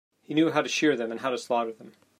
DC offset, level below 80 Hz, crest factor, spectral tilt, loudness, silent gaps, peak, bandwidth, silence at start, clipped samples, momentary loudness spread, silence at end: under 0.1%; -78 dBFS; 18 dB; -4 dB/octave; -27 LUFS; none; -10 dBFS; 14.5 kHz; 0.3 s; under 0.1%; 6 LU; 0.3 s